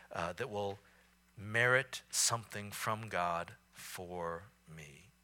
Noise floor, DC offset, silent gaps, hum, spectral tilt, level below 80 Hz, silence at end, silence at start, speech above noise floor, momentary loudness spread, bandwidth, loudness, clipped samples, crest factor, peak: -67 dBFS; under 0.1%; none; none; -2.5 dB/octave; -70 dBFS; 0.2 s; 0 s; 30 dB; 22 LU; 18 kHz; -36 LUFS; under 0.1%; 24 dB; -16 dBFS